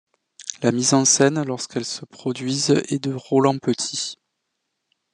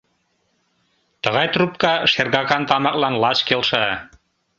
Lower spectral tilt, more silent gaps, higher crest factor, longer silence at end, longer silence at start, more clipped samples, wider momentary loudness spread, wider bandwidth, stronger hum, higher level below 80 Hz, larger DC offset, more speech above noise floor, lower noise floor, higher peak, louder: about the same, -3.5 dB/octave vs -4.5 dB/octave; neither; about the same, 20 dB vs 20 dB; first, 1 s vs 0.55 s; second, 0.4 s vs 1.25 s; neither; first, 13 LU vs 5 LU; first, 11 kHz vs 7.8 kHz; neither; second, -68 dBFS vs -56 dBFS; neither; first, 56 dB vs 48 dB; first, -77 dBFS vs -67 dBFS; about the same, -2 dBFS vs 0 dBFS; second, -21 LUFS vs -18 LUFS